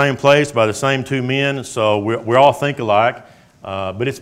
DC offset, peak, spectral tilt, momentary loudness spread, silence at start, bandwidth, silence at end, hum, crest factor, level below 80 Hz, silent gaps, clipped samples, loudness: under 0.1%; 0 dBFS; -5 dB/octave; 12 LU; 0 s; 15.5 kHz; 0 s; none; 16 dB; -56 dBFS; none; 0.1%; -16 LUFS